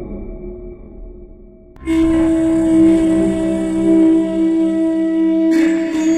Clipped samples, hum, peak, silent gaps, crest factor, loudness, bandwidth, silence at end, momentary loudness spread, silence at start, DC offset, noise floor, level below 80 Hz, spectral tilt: under 0.1%; none; -4 dBFS; none; 12 dB; -14 LUFS; 10 kHz; 0 s; 18 LU; 0 s; under 0.1%; -40 dBFS; -34 dBFS; -7 dB/octave